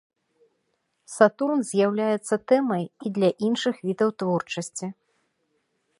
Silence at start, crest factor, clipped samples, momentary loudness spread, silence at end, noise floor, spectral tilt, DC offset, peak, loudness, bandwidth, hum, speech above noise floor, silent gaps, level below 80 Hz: 1.1 s; 24 dB; under 0.1%; 10 LU; 1.05 s; -74 dBFS; -5.5 dB/octave; under 0.1%; -2 dBFS; -24 LUFS; 11.5 kHz; none; 51 dB; none; -74 dBFS